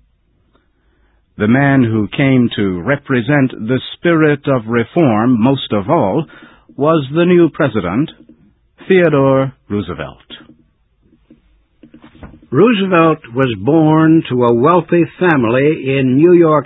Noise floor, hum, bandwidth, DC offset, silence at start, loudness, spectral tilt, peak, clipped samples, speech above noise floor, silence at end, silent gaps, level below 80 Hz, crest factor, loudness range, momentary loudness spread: -57 dBFS; none; 4.1 kHz; under 0.1%; 1.4 s; -13 LUFS; -11 dB/octave; 0 dBFS; under 0.1%; 45 dB; 0 s; none; -46 dBFS; 14 dB; 5 LU; 9 LU